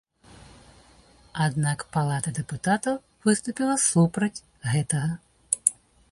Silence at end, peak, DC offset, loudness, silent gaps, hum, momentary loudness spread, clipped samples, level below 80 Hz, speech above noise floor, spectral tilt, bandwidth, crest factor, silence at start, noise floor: 0.4 s; 0 dBFS; under 0.1%; -25 LUFS; none; none; 9 LU; under 0.1%; -58 dBFS; 31 dB; -5 dB/octave; 11.5 kHz; 26 dB; 1.35 s; -55 dBFS